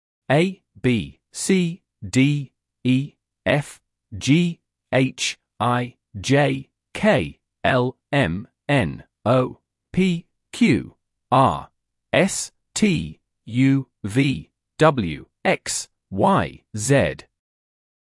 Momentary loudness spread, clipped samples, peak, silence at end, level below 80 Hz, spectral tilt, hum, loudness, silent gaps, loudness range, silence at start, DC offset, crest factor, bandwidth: 12 LU; under 0.1%; -4 dBFS; 1 s; -52 dBFS; -5.5 dB/octave; none; -22 LUFS; none; 2 LU; 0.3 s; under 0.1%; 18 dB; 12 kHz